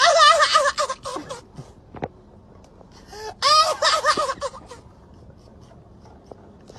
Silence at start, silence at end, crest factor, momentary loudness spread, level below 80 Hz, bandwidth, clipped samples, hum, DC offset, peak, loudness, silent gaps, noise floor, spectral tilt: 0 s; 2 s; 20 dB; 24 LU; -52 dBFS; 13.5 kHz; under 0.1%; none; under 0.1%; -2 dBFS; -18 LUFS; none; -48 dBFS; -0.5 dB/octave